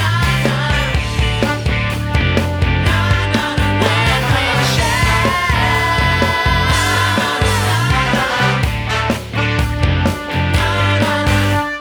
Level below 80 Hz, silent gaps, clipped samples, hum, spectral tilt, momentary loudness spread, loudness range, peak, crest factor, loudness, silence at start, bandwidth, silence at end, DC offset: -24 dBFS; none; under 0.1%; none; -5 dB/octave; 4 LU; 2 LU; 0 dBFS; 14 dB; -15 LUFS; 0 s; over 20 kHz; 0 s; under 0.1%